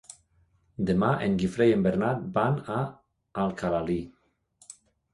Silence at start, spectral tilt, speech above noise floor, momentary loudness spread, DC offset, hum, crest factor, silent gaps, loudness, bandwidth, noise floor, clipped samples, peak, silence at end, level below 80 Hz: 0.8 s; -7.5 dB/octave; 40 dB; 23 LU; under 0.1%; none; 18 dB; none; -27 LUFS; 11.5 kHz; -66 dBFS; under 0.1%; -10 dBFS; 0.4 s; -54 dBFS